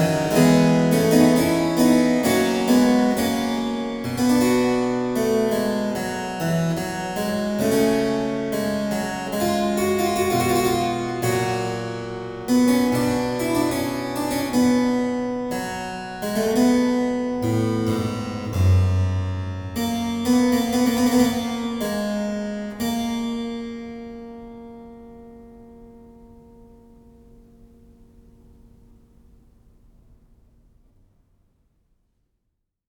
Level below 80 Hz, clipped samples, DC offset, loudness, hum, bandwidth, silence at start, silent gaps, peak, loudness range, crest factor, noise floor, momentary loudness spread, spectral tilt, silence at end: -48 dBFS; under 0.1%; under 0.1%; -21 LUFS; none; over 20 kHz; 0 s; none; -2 dBFS; 8 LU; 20 dB; -76 dBFS; 12 LU; -5.5 dB/octave; 6.6 s